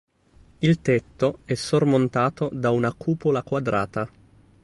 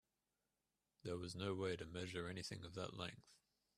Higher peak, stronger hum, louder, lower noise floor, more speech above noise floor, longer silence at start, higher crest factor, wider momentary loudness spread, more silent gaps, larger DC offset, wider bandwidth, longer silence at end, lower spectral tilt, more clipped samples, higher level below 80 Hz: first, -8 dBFS vs -30 dBFS; neither; first, -23 LUFS vs -48 LUFS; second, -55 dBFS vs under -90 dBFS; second, 32 dB vs over 42 dB; second, 0.6 s vs 1.05 s; about the same, 16 dB vs 20 dB; about the same, 7 LU vs 7 LU; neither; neither; second, 11.5 kHz vs 14 kHz; first, 0.55 s vs 0.4 s; first, -7 dB/octave vs -5 dB/octave; neither; first, -54 dBFS vs -74 dBFS